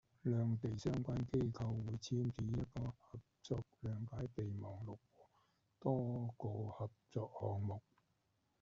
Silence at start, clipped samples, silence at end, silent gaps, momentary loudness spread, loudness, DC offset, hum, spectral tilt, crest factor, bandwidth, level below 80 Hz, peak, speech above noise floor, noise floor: 0.25 s; under 0.1%; 0.8 s; none; 10 LU; -43 LUFS; under 0.1%; none; -9 dB/octave; 18 dB; 7.6 kHz; -64 dBFS; -24 dBFS; 40 dB; -82 dBFS